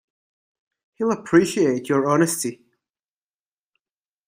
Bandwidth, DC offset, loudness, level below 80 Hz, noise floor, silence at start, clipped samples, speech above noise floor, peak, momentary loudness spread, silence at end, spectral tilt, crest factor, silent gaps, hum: 16 kHz; under 0.1%; -21 LUFS; -66 dBFS; under -90 dBFS; 1 s; under 0.1%; over 70 dB; -4 dBFS; 8 LU; 1.75 s; -5 dB/octave; 20 dB; none; none